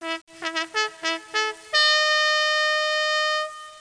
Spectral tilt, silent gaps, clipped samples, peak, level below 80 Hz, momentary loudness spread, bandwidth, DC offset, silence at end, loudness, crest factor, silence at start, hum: 1.5 dB/octave; 0.21-0.27 s; under 0.1%; -6 dBFS; -74 dBFS; 11 LU; 10.5 kHz; under 0.1%; 0 s; -21 LUFS; 18 dB; 0 s; none